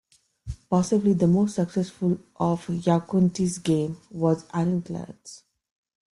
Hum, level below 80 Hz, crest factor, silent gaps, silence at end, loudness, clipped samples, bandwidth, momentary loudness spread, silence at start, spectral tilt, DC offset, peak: none; -52 dBFS; 18 dB; none; 0.8 s; -24 LUFS; under 0.1%; 11.5 kHz; 19 LU; 0.45 s; -7.5 dB/octave; under 0.1%; -8 dBFS